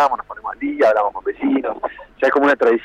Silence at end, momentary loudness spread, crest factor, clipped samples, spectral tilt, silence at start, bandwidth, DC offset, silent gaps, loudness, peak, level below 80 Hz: 0 s; 12 LU; 12 dB; under 0.1%; -5 dB/octave; 0 s; 8.6 kHz; under 0.1%; none; -18 LUFS; -6 dBFS; -54 dBFS